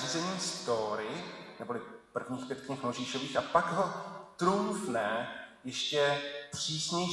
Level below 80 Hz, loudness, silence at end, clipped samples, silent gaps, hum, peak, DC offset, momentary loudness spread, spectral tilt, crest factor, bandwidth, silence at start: -72 dBFS; -34 LUFS; 0 s; under 0.1%; none; none; -12 dBFS; under 0.1%; 12 LU; -3.5 dB/octave; 22 dB; 12 kHz; 0 s